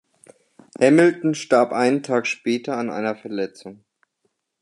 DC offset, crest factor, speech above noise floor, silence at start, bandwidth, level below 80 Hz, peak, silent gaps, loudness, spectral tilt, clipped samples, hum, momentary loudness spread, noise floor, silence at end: under 0.1%; 20 dB; 52 dB; 0.8 s; 11 kHz; -74 dBFS; -2 dBFS; none; -20 LUFS; -5.5 dB/octave; under 0.1%; none; 13 LU; -72 dBFS; 0.9 s